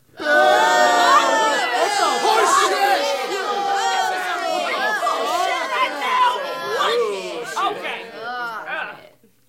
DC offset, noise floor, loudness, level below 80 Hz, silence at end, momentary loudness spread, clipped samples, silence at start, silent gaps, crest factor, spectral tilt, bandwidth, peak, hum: under 0.1%; -49 dBFS; -19 LUFS; -70 dBFS; 0.5 s; 13 LU; under 0.1%; 0.15 s; none; 16 dB; -0.5 dB/octave; 16.5 kHz; -4 dBFS; none